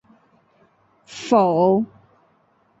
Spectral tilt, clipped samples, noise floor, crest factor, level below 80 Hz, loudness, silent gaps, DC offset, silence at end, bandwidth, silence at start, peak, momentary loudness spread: -7 dB/octave; under 0.1%; -61 dBFS; 20 dB; -66 dBFS; -19 LUFS; none; under 0.1%; 0.95 s; 8 kHz; 1.1 s; -4 dBFS; 18 LU